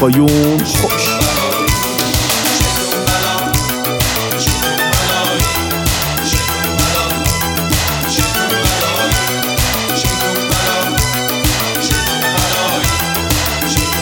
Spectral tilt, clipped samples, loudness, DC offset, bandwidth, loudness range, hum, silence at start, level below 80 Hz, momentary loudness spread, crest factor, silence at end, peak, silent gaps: -3 dB/octave; under 0.1%; -13 LUFS; under 0.1%; over 20 kHz; 1 LU; none; 0 s; -26 dBFS; 2 LU; 14 dB; 0 s; 0 dBFS; none